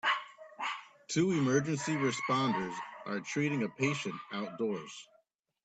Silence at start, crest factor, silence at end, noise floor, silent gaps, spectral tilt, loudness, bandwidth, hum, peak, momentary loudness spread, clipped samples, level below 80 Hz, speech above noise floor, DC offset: 0.05 s; 18 dB; 0.6 s; -72 dBFS; none; -5 dB/octave; -34 LUFS; 9.2 kHz; none; -16 dBFS; 12 LU; under 0.1%; -74 dBFS; 39 dB; under 0.1%